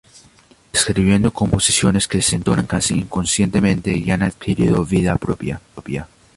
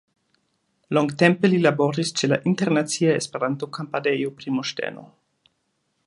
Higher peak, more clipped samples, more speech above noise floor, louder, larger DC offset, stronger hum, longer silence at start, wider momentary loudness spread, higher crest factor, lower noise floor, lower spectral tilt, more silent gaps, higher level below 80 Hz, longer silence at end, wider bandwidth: about the same, -2 dBFS vs -2 dBFS; neither; second, 33 dB vs 51 dB; first, -17 LUFS vs -22 LUFS; neither; neither; second, 0.75 s vs 0.9 s; about the same, 11 LU vs 10 LU; second, 16 dB vs 22 dB; second, -50 dBFS vs -72 dBFS; about the same, -4.5 dB/octave vs -5 dB/octave; neither; first, -36 dBFS vs -70 dBFS; second, 0.3 s vs 1 s; about the same, 11.5 kHz vs 11.5 kHz